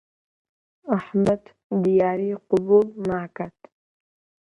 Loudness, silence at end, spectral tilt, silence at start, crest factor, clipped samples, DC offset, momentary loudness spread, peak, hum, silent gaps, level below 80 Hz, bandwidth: -22 LUFS; 1 s; -9 dB/octave; 0.85 s; 18 dB; under 0.1%; under 0.1%; 15 LU; -6 dBFS; none; 1.64-1.70 s; -60 dBFS; 9.8 kHz